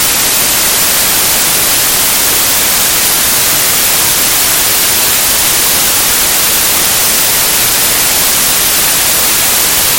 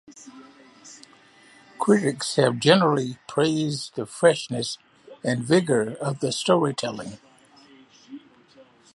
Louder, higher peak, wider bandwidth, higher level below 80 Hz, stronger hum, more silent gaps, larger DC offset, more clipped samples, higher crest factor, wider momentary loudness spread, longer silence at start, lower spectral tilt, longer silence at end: first, -6 LUFS vs -23 LUFS; about the same, 0 dBFS vs -2 dBFS; first, over 20 kHz vs 11.5 kHz; first, -34 dBFS vs -68 dBFS; neither; neither; neither; first, 0.2% vs under 0.1%; second, 10 dB vs 24 dB; second, 0 LU vs 25 LU; about the same, 0 s vs 0.1 s; second, 0 dB/octave vs -5 dB/octave; second, 0 s vs 0.75 s